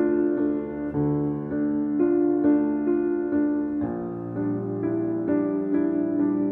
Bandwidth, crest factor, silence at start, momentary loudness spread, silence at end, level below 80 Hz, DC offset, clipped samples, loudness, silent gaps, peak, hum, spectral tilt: 2.6 kHz; 14 dB; 0 s; 7 LU; 0 s; -54 dBFS; under 0.1%; under 0.1%; -25 LUFS; none; -10 dBFS; none; -12.5 dB/octave